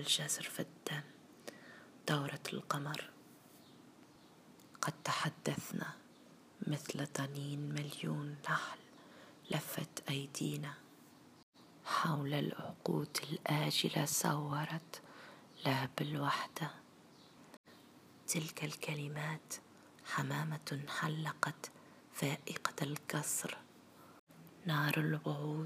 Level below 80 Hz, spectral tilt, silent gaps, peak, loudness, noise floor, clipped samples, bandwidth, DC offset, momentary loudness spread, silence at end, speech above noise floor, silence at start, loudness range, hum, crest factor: -84 dBFS; -4 dB/octave; 11.43-11.53 s, 17.57-17.64 s, 24.19-24.27 s; -14 dBFS; -39 LUFS; -62 dBFS; under 0.1%; 15.5 kHz; under 0.1%; 23 LU; 0 s; 23 dB; 0 s; 6 LU; none; 28 dB